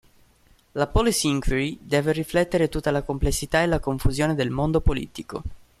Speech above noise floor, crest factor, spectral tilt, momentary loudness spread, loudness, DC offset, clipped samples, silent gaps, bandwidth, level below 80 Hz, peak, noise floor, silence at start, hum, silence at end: 35 dB; 16 dB; -5 dB/octave; 12 LU; -24 LUFS; under 0.1%; under 0.1%; none; 14.5 kHz; -32 dBFS; -6 dBFS; -58 dBFS; 0.75 s; none; 0.25 s